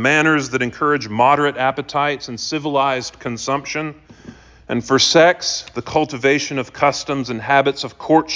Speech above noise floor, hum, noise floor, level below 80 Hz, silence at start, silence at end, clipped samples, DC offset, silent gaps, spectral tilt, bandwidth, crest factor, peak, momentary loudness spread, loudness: 23 dB; none; -41 dBFS; -52 dBFS; 0 s; 0 s; under 0.1%; under 0.1%; none; -3.5 dB/octave; 7.6 kHz; 16 dB; -2 dBFS; 11 LU; -18 LUFS